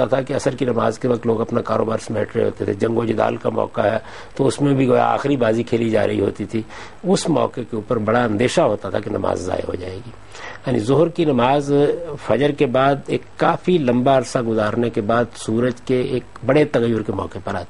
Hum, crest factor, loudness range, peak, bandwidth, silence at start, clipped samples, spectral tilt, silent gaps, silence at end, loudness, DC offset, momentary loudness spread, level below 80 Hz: none; 18 dB; 3 LU; -2 dBFS; 11.5 kHz; 0 s; under 0.1%; -6.5 dB/octave; none; 0.05 s; -19 LUFS; 1%; 10 LU; -48 dBFS